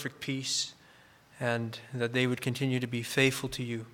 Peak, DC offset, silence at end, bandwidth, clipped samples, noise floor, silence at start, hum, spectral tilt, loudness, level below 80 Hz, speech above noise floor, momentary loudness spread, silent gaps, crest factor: -10 dBFS; under 0.1%; 0 s; 18 kHz; under 0.1%; -59 dBFS; 0 s; none; -4 dB/octave; -31 LUFS; -64 dBFS; 27 dB; 9 LU; none; 22 dB